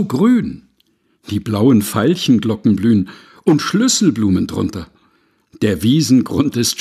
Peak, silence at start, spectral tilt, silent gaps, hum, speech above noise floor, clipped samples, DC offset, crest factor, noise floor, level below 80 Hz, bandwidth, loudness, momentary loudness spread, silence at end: 0 dBFS; 0 s; -5.5 dB/octave; none; none; 46 dB; under 0.1%; under 0.1%; 14 dB; -60 dBFS; -48 dBFS; 14.5 kHz; -15 LUFS; 11 LU; 0 s